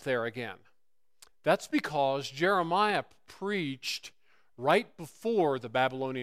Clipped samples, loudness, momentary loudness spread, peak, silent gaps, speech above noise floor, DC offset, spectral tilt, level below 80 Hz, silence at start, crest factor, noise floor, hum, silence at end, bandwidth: under 0.1%; -30 LUFS; 12 LU; -10 dBFS; none; 54 dB; under 0.1%; -5 dB/octave; -72 dBFS; 0 s; 22 dB; -85 dBFS; none; 0 s; 15.5 kHz